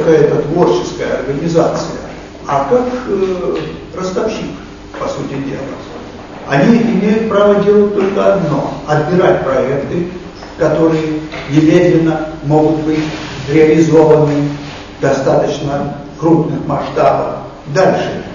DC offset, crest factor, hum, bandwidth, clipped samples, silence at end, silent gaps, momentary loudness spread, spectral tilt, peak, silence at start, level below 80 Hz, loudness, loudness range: under 0.1%; 12 dB; none; 7.4 kHz; 0.1%; 0 s; none; 14 LU; -7 dB/octave; 0 dBFS; 0 s; -38 dBFS; -13 LUFS; 6 LU